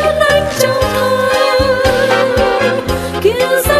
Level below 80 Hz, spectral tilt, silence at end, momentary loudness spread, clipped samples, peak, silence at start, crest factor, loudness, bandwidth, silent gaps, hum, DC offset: -30 dBFS; -4 dB/octave; 0 s; 3 LU; under 0.1%; 0 dBFS; 0 s; 12 dB; -12 LUFS; 14.5 kHz; none; none; under 0.1%